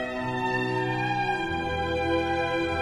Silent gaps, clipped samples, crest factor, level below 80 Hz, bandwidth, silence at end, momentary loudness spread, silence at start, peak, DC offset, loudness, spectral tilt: none; under 0.1%; 14 dB; -46 dBFS; 12.5 kHz; 0 s; 3 LU; 0 s; -14 dBFS; under 0.1%; -27 LUFS; -6 dB/octave